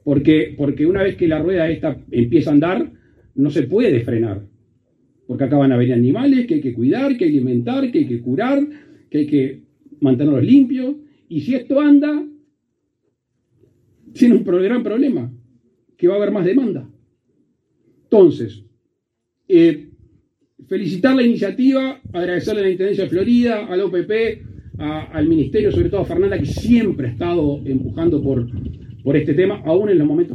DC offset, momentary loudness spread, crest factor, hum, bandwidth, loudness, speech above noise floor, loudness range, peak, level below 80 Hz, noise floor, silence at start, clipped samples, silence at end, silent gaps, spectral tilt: under 0.1%; 12 LU; 16 dB; none; 6.6 kHz; -17 LUFS; 58 dB; 3 LU; 0 dBFS; -44 dBFS; -74 dBFS; 0.05 s; under 0.1%; 0 s; none; -8.5 dB/octave